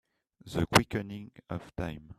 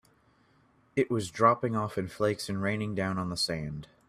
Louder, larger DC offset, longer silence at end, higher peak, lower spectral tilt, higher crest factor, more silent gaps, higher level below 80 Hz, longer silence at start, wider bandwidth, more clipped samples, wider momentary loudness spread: about the same, -31 LUFS vs -30 LUFS; neither; second, 0.05 s vs 0.25 s; about the same, -6 dBFS vs -8 dBFS; about the same, -4.5 dB/octave vs -5.5 dB/octave; first, 28 dB vs 22 dB; neither; first, -52 dBFS vs -60 dBFS; second, 0.45 s vs 0.95 s; about the same, 15 kHz vs 14.5 kHz; neither; first, 16 LU vs 9 LU